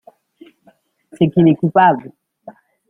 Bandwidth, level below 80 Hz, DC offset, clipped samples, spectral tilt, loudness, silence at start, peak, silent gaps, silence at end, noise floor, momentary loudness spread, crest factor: 3.6 kHz; -56 dBFS; under 0.1%; under 0.1%; -9.5 dB/octave; -14 LUFS; 1.2 s; -2 dBFS; none; 0.4 s; -55 dBFS; 6 LU; 16 dB